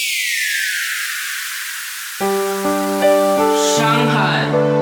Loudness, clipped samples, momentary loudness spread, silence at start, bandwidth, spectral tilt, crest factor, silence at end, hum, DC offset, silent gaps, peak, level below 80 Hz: -17 LUFS; under 0.1%; 8 LU; 0 s; over 20 kHz; -3.5 dB/octave; 14 dB; 0 s; none; under 0.1%; none; -2 dBFS; -60 dBFS